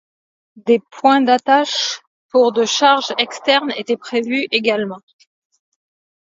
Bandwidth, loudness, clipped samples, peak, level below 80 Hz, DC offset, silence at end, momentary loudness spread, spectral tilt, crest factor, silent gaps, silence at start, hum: 7.8 kHz; -16 LUFS; under 0.1%; 0 dBFS; -72 dBFS; under 0.1%; 1.35 s; 9 LU; -2.5 dB/octave; 18 dB; 2.07-2.29 s; 0.55 s; none